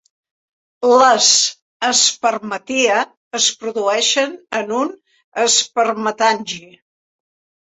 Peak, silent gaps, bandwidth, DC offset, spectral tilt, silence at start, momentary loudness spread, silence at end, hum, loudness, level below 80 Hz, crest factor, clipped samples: 0 dBFS; 1.62-1.80 s, 3.17-3.31 s, 5.24-5.32 s; 8.4 kHz; under 0.1%; 0 dB/octave; 0.8 s; 13 LU; 1.15 s; none; -15 LUFS; -68 dBFS; 18 dB; under 0.1%